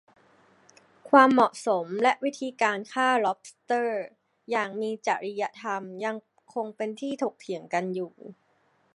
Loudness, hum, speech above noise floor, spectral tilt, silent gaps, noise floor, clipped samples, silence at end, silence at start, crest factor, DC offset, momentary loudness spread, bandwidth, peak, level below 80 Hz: -27 LUFS; none; 41 dB; -4.5 dB/octave; none; -67 dBFS; under 0.1%; 0.65 s; 1.05 s; 24 dB; under 0.1%; 14 LU; 11.5 kHz; -2 dBFS; -82 dBFS